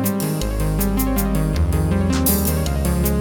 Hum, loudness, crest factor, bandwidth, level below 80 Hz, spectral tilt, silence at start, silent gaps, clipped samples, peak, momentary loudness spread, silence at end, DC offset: none; -20 LUFS; 12 dB; over 20 kHz; -24 dBFS; -5.5 dB/octave; 0 s; none; under 0.1%; -6 dBFS; 5 LU; 0 s; under 0.1%